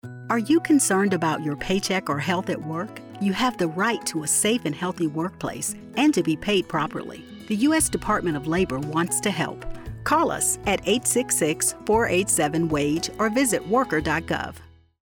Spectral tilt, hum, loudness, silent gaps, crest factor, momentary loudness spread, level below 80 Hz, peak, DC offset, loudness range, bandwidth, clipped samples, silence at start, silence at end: -3.5 dB/octave; none; -23 LUFS; none; 14 dB; 9 LU; -46 dBFS; -10 dBFS; under 0.1%; 3 LU; 19.5 kHz; under 0.1%; 0.05 s; 0.4 s